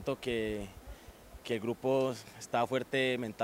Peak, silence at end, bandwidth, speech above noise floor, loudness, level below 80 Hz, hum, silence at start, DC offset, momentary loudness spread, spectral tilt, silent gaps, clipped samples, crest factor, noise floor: -16 dBFS; 0 s; 16 kHz; 19 dB; -34 LUFS; -58 dBFS; none; 0 s; under 0.1%; 20 LU; -5 dB/octave; none; under 0.1%; 18 dB; -53 dBFS